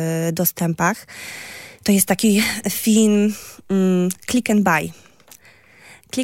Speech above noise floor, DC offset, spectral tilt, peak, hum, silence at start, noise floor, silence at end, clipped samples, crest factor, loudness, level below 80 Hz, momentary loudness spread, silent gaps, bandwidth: 31 dB; under 0.1%; -4.5 dB/octave; -2 dBFS; none; 0 s; -49 dBFS; 0 s; under 0.1%; 18 dB; -18 LUFS; -58 dBFS; 16 LU; none; 16.5 kHz